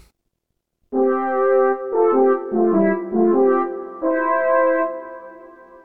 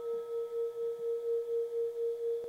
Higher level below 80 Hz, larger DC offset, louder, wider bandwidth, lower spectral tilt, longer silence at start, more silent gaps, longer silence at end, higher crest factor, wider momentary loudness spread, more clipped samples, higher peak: first, -62 dBFS vs -84 dBFS; first, 0.6% vs under 0.1%; first, -18 LUFS vs -36 LUFS; second, 3.3 kHz vs 8.8 kHz; first, -11 dB/octave vs -4.5 dB/octave; first, 0.9 s vs 0 s; neither; about the same, 0.05 s vs 0 s; first, 14 dB vs 8 dB; first, 10 LU vs 3 LU; neither; first, -6 dBFS vs -28 dBFS